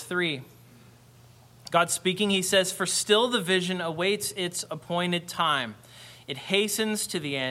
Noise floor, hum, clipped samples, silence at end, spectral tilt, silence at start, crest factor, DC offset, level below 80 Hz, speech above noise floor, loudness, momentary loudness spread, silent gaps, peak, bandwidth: -54 dBFS; none; under 0.1%; 0 s; -3 dB/octave; 0 s; 22 dB; under 0.1%; -68 dBFS; 27 dB; -26 LUFS; 14 LU; none; -6 dBFS; 16.5 kHz